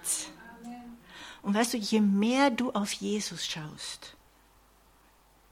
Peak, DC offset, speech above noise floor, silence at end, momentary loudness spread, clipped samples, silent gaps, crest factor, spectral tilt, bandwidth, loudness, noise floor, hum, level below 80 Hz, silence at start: -14 dBFS; under 0.1%; 33 dB; 1.4 s; 21 LU; under 0.1%; none; 18 dB; -4 dB/octave; 16 kHz; -29 LUFS; -62 dBFS; none; -66 dBFS; 0 s